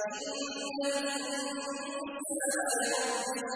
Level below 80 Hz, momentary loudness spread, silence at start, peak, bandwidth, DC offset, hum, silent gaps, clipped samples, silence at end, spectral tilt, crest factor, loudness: -78 dBFS; 7 LU; 0 s; -20 dBFS; 11 kHz; under 0.1%; none; none; under 0.1%; 0 s; -0.5 dB/octave; 14 dB; -33 LUFS